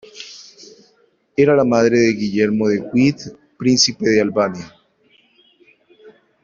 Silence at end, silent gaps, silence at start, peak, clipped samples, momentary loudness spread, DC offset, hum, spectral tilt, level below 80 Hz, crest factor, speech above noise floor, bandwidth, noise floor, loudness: 0.35 s; none; 0.15 s; -2 dBFS; under 0.1%; 21 LU; under 0.1%; none; -4.5 dB/octave; -56 dBFS; 18 dB; 43 dB; 7.4 kHz; -59 dBFS; -16 LUFS